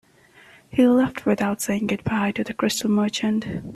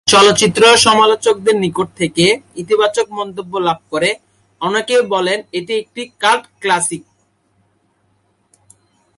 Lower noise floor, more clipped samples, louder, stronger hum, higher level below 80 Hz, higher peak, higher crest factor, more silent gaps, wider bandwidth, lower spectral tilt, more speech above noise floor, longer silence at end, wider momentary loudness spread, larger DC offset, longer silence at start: second, -52 dBFS vs -60 dBFS; neither; second, -22 LUFS vs -14 LUFS; neither; about the same, -54 dBFS vs -54 dBFS; second, -6 dBFS vs 0 dBFS; about the same, 16 dB vs 16 dB; neither; first, 14 kHz vs 11.5 kHz; first, -5 dB/octave vs -3 dB/octave; second, 31 dB vs 46 dB; second, 0 s vs 2.2 s; second, 7 LU vs 13 LU; neither; first, 0.75 s vs 0.05 s